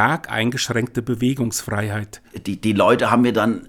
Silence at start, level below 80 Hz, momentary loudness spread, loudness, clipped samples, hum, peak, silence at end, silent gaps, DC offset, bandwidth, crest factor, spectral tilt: 0 s; -52 dBFS; 13 LU; -20 LUFS; under 0.1%; none; -2 dBFS; 0.05 s; none; under 0.1%; 18.5 kHz; 18 dB; -5 dB/octave